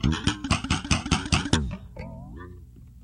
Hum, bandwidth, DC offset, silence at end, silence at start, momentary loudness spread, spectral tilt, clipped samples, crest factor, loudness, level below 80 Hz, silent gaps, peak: 60 Hz at -45 dBFS; 11.5 kHz; under 0.1%; 0 s; 0 s; 19 LU; -4 dB/octave; under 0.1%; 24 dB; -26 LUFS; -36 dBFS; none; -2 dBFS